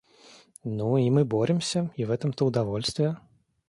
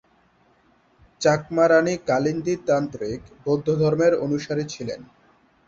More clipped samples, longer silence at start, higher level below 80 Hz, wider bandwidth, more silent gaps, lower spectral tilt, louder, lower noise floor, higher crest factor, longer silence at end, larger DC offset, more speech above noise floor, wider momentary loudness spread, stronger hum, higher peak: neither; second, 0.65 s vs 1.2 s; about the same, -60 dBFS vs -56 dBFS; first, 11.5 kHz vs 7.8 kHz; neither; about the same, -6.5 dB/octave vs -6 dB/octave; second, -26 LUFS vs -22 LUFS; second, -54 dBFS vs -60 dBFS; about the same, 16 dB vs 18 dB; second, 0.5 s vs 0.65 s; neither; second, 29 dB vs 39 dB; second, 9 LU vs 14 LU; neither; second, -10 dBFS vs -6 dBFS